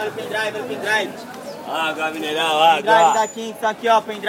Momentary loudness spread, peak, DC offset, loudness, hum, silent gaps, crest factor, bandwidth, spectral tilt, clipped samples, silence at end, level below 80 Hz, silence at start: 13 LU; -2 dBFS; under 0.1%; -19 LUFS; none; none; 16 dB; 16.5 kHz; -2.5 dB/octave; under 0.1%; 0 s; -72 dBFS; 0 s